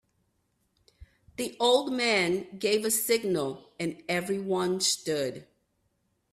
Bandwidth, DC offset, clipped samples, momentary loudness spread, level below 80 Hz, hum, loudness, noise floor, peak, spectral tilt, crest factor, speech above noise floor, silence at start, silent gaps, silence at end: 15.5 kHz; under 0.1%; under 0.1%; 11 LU; -66 dBFS; none; -28 LUFS; -75 dBFS; -12 dBFS; -3 dB/octave; 18 dB; 47 dB; 1 s; none; 0.9 s